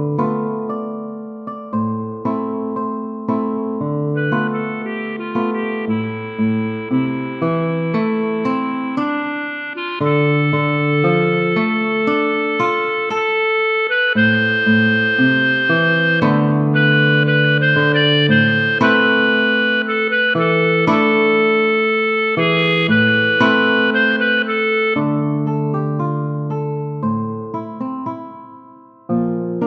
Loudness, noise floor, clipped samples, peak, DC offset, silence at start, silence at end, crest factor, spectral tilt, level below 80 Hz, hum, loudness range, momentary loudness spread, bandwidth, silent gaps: -17 LUFS; -43 dBFS; under 0.1%; -2 dBFS; under 0.1%; 0 s; 0 s; 16 dB; -8 dB/octave; -60 dBFS; none; 8 LU; 10 LU; 6.4 kHz; none